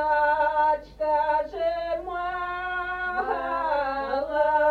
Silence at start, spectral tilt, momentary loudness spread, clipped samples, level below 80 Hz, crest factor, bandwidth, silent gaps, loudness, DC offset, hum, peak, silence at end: 0 s; -5.5 dB/octave; 7 LU; under 0.1%; -50 dBFS; 14 dB; 6.2 kHz; none; -26 LUFS; under 0.1%; 50 Hz at -50 dBFS; -10 dBFS; 0 s